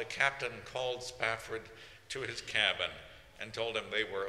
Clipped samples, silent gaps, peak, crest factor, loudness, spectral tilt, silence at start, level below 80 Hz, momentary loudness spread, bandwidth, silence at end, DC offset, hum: under 0.1%; none; -12 dBFS; 24 dB; -35 LUFS; -2 dB/octave; 0 s; -64 dBFS; 17 LU; 15.5 kHz; 0 s; under 0.1%; none